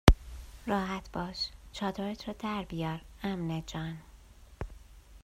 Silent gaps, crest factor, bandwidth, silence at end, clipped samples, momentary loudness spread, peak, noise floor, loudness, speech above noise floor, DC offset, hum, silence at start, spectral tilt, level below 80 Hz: none; 32 dB; 15 kHz; 0.05 s; under 0.1%; 13 LU; -2 dBFS; -54 dBFS; -36 LUFS; 19 dB; under 0.1%; none; 0.05 s; -6 dB/octave; -38 dBFS